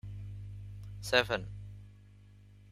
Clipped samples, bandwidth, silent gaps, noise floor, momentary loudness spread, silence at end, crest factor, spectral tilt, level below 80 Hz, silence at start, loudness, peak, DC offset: under 0.1%; 15.5 kHz; none; -57 dBFS; 22 LU; 0 s; 30 dB; -4 dB/octave; -54 dBFS; 0.05 s; -33 LUFS; -8 dBFS; under 0.1%